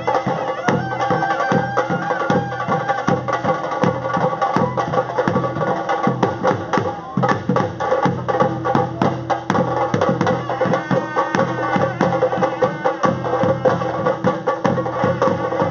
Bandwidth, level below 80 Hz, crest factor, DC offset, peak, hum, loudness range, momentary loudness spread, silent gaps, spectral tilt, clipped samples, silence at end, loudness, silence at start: 7.2 kHz; -54 dBFS; 18 dB; under 0.1%; 0 dBFS; none; 1 LU; 2 LU; none; -5.5 dB/octave; under 0.1%; 0 s; -19 LUFS; 0 s